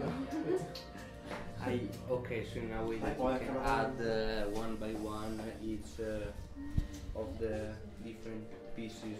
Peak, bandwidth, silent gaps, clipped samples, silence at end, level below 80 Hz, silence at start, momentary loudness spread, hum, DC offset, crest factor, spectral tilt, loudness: -20 dBFS; 15.5 kHz; none; under 0.1%; 0 s; -48 dBFS; 0 s; 11 LU; none; under 0.1%; 18 dB; -6.5 dB/octave; -39 LUFS